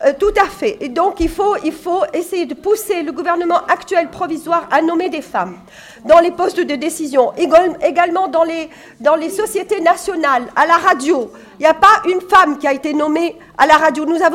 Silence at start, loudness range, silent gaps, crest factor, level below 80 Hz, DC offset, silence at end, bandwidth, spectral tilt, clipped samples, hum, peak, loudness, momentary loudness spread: 0 s; 5 LU; none; 14 dB; -42 dBFS; under 0.1%; 0 s; 16.5 kHz; -3.5 dB/octave; under 0.1%; none; 0 dBFS; -15 LUFS; 9 LU